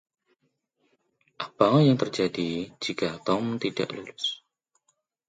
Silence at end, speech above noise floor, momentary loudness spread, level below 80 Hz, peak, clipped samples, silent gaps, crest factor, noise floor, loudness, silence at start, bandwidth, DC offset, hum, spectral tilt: 0.95 s; 49 dB; 13 LU; -66 dBFS; -4 dBFS; under 0.1%; none; 24 dB; -75 dBFS; -26 LUFS; 1.4 s; 9.2 kHz; under 0.1%; none; -6 dB/octave